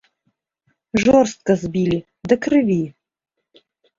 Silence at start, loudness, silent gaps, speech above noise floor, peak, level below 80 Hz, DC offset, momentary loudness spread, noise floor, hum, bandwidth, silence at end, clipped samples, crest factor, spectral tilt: 0.95 s; -18 LUFS; none; 54 dB; -2 dBFS; -50 dBFS; under 0.1%; 9 LU; -71 dBFS; none; 7.8 kHz; 1.1 s; under 0.1%; 18 dB; -6.5 dB/octave